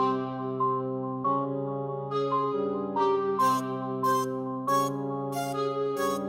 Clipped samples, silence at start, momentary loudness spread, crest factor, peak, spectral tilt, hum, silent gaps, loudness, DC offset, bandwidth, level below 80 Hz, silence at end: under 0.1%; 0 s; 6 LU; 14 dB; -14 dBFS; -6 dB/octave; none; none; -29 LUFS; under 0.1%; 18 kHz; -74 dBFS; 0 s